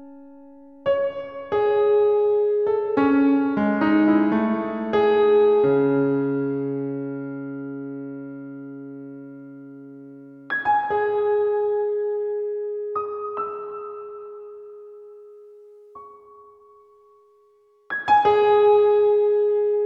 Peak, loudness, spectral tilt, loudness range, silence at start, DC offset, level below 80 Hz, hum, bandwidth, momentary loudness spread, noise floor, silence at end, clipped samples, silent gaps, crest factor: -8 dBFS; -21 LUFS; -8.5 dB/octave; 16 LU; 0 s; under 0.1%; -62 dBFS; none; 5 kHz; 22 LU; -58 dBFS; 0 s; under 0.1%; none; 14 dB